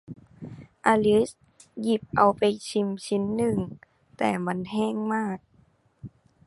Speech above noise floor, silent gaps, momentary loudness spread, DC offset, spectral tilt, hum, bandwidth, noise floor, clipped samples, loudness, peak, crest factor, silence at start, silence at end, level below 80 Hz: 37 dB; none; 23 LU; under 0.1%; -6 dB/octave; none; 11.5 kHz; -62 dBFS; under 0.1%; -26 LUFS; -4 dBFS; 22 dB; 0.1 s; 0.4 s; -58 dBFS